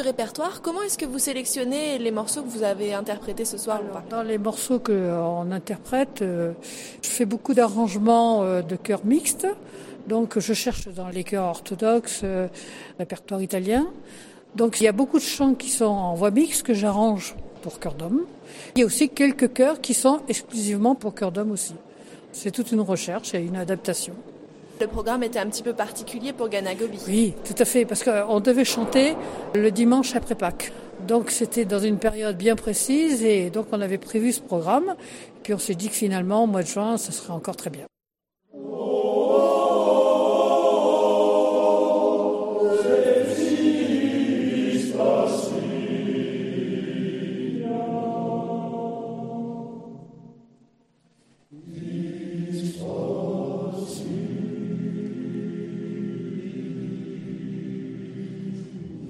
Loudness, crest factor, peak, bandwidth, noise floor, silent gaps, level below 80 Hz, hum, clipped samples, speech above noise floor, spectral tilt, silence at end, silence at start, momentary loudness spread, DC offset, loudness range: -24 LUFS; 18 dB; -6 dBFS; 16.5 kHz; -88 dBFS; none; -52 dBFS; none; under 0.1%; 64 dB; -4.5 dB/octave; 0 s; 0 s; 14 LU; under 0.1%; 10 LU